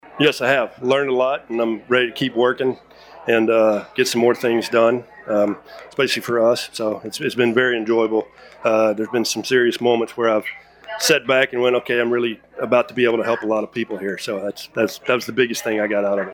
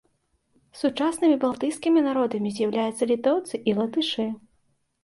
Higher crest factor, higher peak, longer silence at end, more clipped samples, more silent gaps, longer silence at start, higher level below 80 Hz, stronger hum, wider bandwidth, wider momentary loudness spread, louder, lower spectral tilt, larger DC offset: about the same, 18 dB vs 16 dB; first, -2 dBFS vs -10 dBFS; second, 0 s vs 0.65 s; neither; neither; second, 0.15 s vs 0.75 s; about the same, -64 dBFS vs -68 dBFS; neither; first, 18.5 kHz vs 11.5 kHz; first, 9 LU vs 6 LU; first, -19 LUFS vs -24 LUFS; about the same, -4 dB/octave vs -5 dB/octave; neither